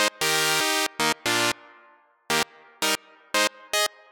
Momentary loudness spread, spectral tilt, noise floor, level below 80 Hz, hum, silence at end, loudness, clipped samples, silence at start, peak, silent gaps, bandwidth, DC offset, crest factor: 7 LU; -1 dB/octave; -57 dBFS; -66 dBFS; none; 0.25 s; -24 LUFS; under 0.1%; 0 s; -4 dBFS; none; 19 kHz; under 0.1%; 24 dB